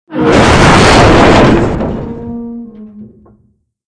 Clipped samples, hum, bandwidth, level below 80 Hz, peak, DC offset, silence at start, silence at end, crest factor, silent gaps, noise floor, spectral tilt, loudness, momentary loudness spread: 2%; none; 11 kHz; -22 dBFS; 0 dBFS; under 0.1%; 0.1 s; 0.85 s; 8 dB; none; -54 dBFS; -5.5 dB/octave; -6 LUFS; 18 LU